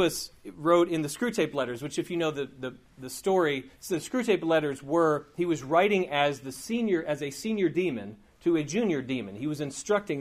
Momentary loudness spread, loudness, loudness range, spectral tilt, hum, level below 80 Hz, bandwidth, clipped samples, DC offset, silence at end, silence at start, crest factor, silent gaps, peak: 11 LU; -28 LUFS; 3 LU; -5 dB/octave; none; -62 dBFS; 15.5 kHz; under 0.1%; under 0.1%; 0 s; 0 s; 18 dB; none; -10 dBFS